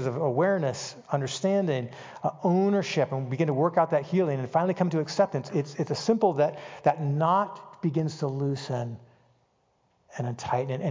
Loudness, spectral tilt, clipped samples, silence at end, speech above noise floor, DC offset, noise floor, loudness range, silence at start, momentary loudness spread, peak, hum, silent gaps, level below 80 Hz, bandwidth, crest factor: -27 LUFS; -6.5 dB/octave; under 0.1%; 0 s; 43 dB; under 0.1%; -69 dBFS; 4 LU; 0 s; 9 LU; -10 dBFS; none; none; -68 dBFS; 7.6 kHz; 18 dB